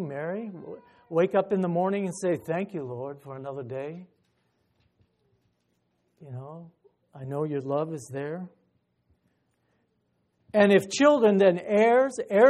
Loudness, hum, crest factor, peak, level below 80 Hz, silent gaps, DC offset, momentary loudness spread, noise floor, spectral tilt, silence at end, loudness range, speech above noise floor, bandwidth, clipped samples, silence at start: -25 LUFS; none; 20 dB; -6 dBFS; -74 dBFS; none; under 0.1%; 22 LU; -73 dBFS; -6 dB/octave; 0 s; 19 LU; 48 dB; 13.5 kHz; under 0.1%; 0 s